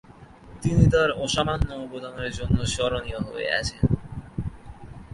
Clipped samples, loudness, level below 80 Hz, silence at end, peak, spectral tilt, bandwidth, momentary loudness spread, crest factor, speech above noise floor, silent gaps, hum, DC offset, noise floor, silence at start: under 0.1%; -25 LUFS; -36 dBFS; 0 s; -4 dBFS; -5.5 dB/octave; 11.5 kHz; 16 LU; 20 dB; 23 dB; none; none; under 0.1%; -47 dBFS; 0.1 s